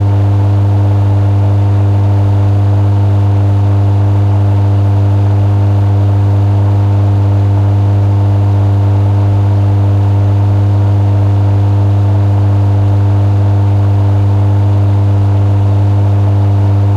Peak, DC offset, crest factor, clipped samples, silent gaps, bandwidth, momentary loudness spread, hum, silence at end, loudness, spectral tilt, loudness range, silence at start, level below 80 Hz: -2 dBFS; under 0.1%; 6 dB; under 0.1%; none; 4.6 kHz; 0 LU; none; 0 s; -10 LUFS; -9.5 dB/octave; 0 LU; 0 s; -34 dBFS